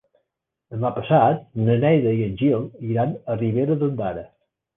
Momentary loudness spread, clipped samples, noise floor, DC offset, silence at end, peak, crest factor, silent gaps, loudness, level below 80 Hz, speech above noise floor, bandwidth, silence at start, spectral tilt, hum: 10 LU; under 0.1%; -79 dBFS; under 0.1%; 0.5 s; -4 dBFS; 18 dB; none; -21 LUFS; -54 dBFS; 58 dB; 3.8 kHz; 0.7 s; -11.5 dB/octave; none